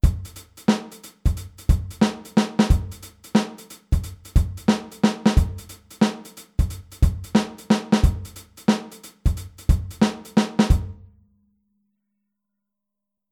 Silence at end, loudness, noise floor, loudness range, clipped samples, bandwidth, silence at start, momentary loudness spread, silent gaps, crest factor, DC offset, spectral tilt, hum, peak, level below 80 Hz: 2.4 s; -23 LUFS; -84 dBFS; 2 LU; under 0.1%; 16.5 kHz; 0.05 s; 15 LU; none; 18 dB; under 0.1%; -6.5 dB/octave; none; -4 dBFS; -26 dBFS